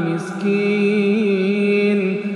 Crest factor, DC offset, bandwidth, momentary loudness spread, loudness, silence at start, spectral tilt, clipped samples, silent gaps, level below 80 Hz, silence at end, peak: 10 dB; under 0.1%; 10.5 kHz; 4 LU; -18 LUFS; 0 s; -7.5 dB/octave; under 0.1%; none; -70 dBFS; 0 s; -8 dBFS